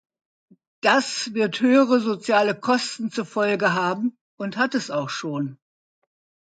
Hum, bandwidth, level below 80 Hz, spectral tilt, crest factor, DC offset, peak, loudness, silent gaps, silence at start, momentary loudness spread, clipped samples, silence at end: none; 9.2 kHz; -74 dBFS; -4.5 dB/octave; 18 dB; under 0.1%; -6 dBFS; -22 LUFS; 4.21-4.38 s; 0.85 s; 11 LU; under 0.1%; 1 s